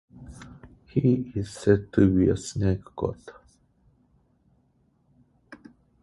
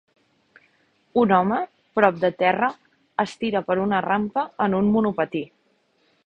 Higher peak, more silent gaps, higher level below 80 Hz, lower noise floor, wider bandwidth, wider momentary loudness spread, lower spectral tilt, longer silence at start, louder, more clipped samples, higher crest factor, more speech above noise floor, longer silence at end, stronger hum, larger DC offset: second, -6 dBFS vs -2 dBFS; neither; first, -46 dBFS vs -60 dBFS; about the same, -66 dBFS vs -65 dBFS; first, 11.5 kHz vs 8.8 kHz; first, 25 LU vs 8 LU; about the same, -7.5 dB/octave vs -7.5 dB/octave; second, 0.15 s vs 1.15 s; second, -25 LUFS vs -22 LUFS; neither; about the same, 22 dB vs 22 dB; about the same, 42 dB vs 44 dB; second, 0.45 s vs 0.8 s; neither; neither